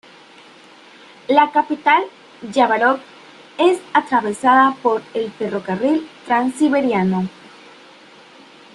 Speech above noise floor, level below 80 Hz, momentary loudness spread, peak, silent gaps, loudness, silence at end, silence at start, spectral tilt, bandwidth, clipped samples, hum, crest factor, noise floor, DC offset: 28 dB; -64 dBFS; 10 LU; 0 dBFS; none; -17 LUFS; 1.45 s; 1.3 s; -5.5 dB/octave; 11.5 kHz; under 0.1%; none; 18 dB; -45 dBFS; under 0.1%